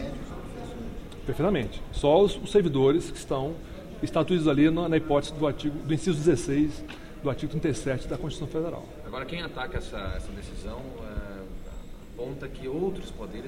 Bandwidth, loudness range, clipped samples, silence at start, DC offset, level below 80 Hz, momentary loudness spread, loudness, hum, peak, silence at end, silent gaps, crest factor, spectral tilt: 15.5 kHz; 12 LU; under 0.1%; 0 s; under 0.1%; -42 dBFS; 17 LU; -28 LUFS; none; -8 dBFS; 0 s; none; 20 dB; -6.5 dB/octave